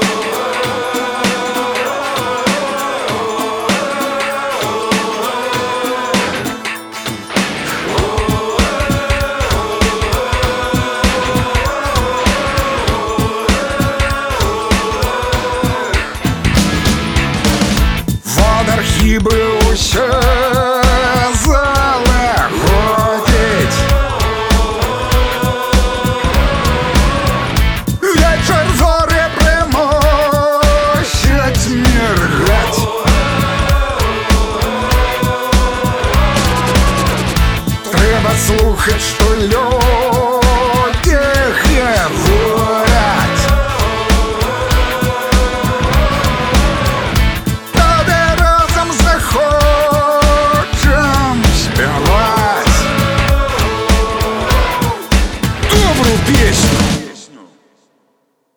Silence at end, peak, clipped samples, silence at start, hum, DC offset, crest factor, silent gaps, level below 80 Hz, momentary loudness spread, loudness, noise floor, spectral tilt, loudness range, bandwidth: 1.1 s; 0 dBFS; under 0.1%; 0 s; none; under 0.1%; 12 dB; none; -18 dBFS; 5 LU; -13 LUFS; -61 dBFS; -4.5 dB/octave; 4 LU; over 20 kHz